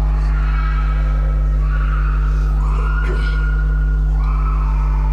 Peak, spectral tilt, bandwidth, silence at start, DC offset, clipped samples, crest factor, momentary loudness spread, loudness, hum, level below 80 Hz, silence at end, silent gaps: -8 dBFS; -8 dB/octave; 4.5 kHz; 0 s; under 0.1%; under 0.1%; 6 dB; 0 LU; -19 LUFS; none; -16 dBFS; 0 s; none